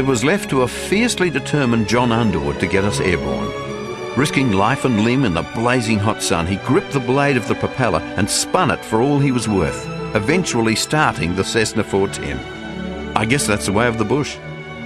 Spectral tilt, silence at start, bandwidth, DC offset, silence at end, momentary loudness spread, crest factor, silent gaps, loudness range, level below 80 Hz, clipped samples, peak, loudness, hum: -5 dB/octave; 0 s; 12 kHz; under 0.1%; 0 s; 8 LU; 18 dB; none; 2 LU; -40 dBFS; under 0.1%; 0 dBFS; -18 LUFS; none